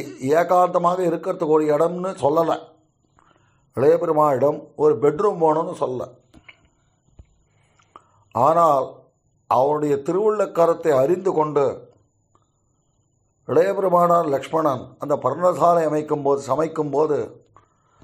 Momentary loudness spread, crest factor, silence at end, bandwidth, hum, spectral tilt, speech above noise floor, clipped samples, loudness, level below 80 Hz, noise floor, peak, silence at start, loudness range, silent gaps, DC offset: 9 LU; 16 dB; 0.7 s; 15 kHz; none; -7 dB/octave; 47 dB; under 0.1%; -20 LUFS; -64 dBFS; -66 dBFS; -4 dBFS; 0 s; 4 LU; none; under 0.1%